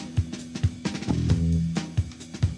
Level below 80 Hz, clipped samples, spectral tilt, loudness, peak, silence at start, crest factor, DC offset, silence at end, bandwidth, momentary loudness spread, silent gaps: -36 dBFS; under 0.1%; -6.5 dB/octave; -27 LUFS; -10 dBFS; 0 s; 16 dB; under 0.1%; 0 s; 10.5 kHz; 8 LU; none